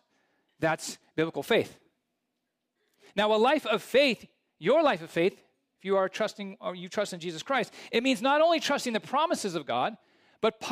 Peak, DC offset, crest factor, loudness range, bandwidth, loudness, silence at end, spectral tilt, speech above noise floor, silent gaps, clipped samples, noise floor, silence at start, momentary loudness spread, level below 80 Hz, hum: -12 dBFS; under 0.1%; 16 dB; 4 LU; 15.5 kHz; -28 LUFS; 0 s; -4 dB/octave; 55 dB; none; under 0.1%; -82 dBFS; 0.6 s; 11 LU; -74 dBFS; none